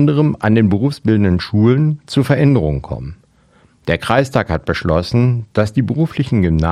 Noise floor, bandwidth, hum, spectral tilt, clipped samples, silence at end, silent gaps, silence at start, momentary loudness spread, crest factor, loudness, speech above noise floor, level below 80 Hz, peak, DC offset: -52 dBFS; 13 kHz; none; -8 dB/octave; under 0.1%; 0 s; none; 0 s; 7 LU; 14 dB; -15 LUFS; 37 dB; -34 dBFS; 0 dBFS; under 0.1%